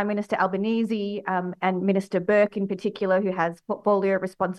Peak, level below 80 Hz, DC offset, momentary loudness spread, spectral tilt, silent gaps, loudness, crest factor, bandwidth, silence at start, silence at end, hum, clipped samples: -8 dBFS; -68 dBFS; under 0.1%; 6 LU; -7.5 dB/octave; none; -25 LUFS; 16 dB; 11.5 kHz; 0 s; 0 s; none; under 0.1%